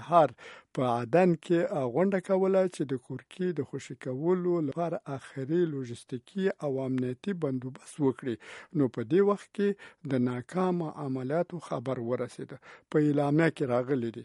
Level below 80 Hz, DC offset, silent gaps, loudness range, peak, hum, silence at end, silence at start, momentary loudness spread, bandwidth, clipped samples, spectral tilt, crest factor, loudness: -74 dBFS; under 0.1%; none; 4 LU; -8 dBFS; none; 0 s; 0 s; 13 LU; 11.5 kHz; under 0.1%; -7.5 dB/octave; 22 dB; -30 LUFS